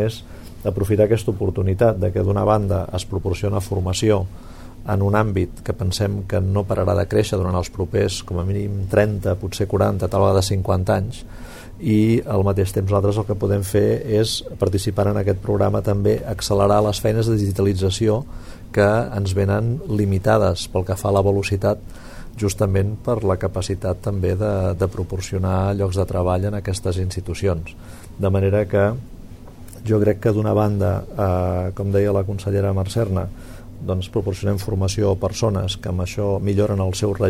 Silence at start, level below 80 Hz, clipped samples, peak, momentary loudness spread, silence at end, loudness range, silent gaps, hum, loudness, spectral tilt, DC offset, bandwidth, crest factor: 0 s; -38 dBFS; under 0.1%; -2 dBFS; 8 LU; 0 s; 3 LU; none; none; -20 LUFS; -6.5 dB/octave; 0.4%; 15 kHz; 16 dB